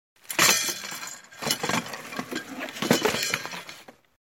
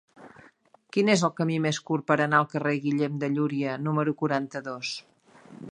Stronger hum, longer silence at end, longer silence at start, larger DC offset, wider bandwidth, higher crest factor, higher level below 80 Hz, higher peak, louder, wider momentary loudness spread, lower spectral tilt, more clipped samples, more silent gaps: neither; first, 0.4 s vs 0 s; about the same, 0.3 s vs 0.2 s; neither; first, 17 kHz vs 10.5 kHz; first, 26 dB vs 20 dB; first, -66 dBFS vs -74 dBFS; about the same, -4 dBFS vs -6 dBFS; about the same, -26 LUFS vs -26 LUFS; first, 17 LU vs 11 LU; second, -1.5 dB/octave vs -5.5 dB/octave; neither; neither